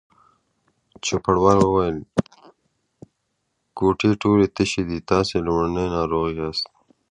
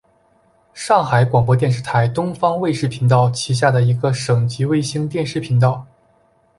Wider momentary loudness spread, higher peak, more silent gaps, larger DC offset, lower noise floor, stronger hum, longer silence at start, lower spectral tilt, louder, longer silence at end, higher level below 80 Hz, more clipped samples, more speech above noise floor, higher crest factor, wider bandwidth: first, 10 LU vs 6 LU; about the same, -2 dBFS vs -2 dBFS; neither; neither; first, -74 dBFS vs -57 dBFS; neither; first, 1.05 s vs 0.75 s; about the same, -6 dB/octave vs -6.5 dB/octave; second, -21 LUFS vs -17 LUFS; second, 0.45 s vs 0.75 s; first, -44 dBFS vs -50 dBFS; neither; first, 54 dB vs 41 dB; about the same, 20 dB vs 16 dB; about the same, 10.5 kHz vs 11.5 kHz